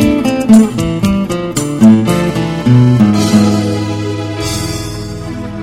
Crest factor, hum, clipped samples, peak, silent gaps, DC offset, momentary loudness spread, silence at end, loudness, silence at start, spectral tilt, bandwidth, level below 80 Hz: 10 dB; none; 2%; 0 dBFS; none; under 0.1%; 12 LU; 0 s; -11 LUFS; 0 s; -6.5 dB/octave; 15.5 kHz; -32 dBFS